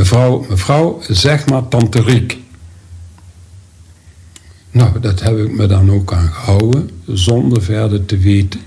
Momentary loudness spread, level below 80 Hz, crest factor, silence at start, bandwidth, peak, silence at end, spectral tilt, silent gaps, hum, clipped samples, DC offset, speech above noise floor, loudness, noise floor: 5 LU; -32 dBFS; 12 dB; 0 s; 11 kHz; 0 dBFS; 0 s; -6.5 dB/octave; none; none; under 0.1%; under 0.1%; 29 dB; -13 LUFS; -41 dBFS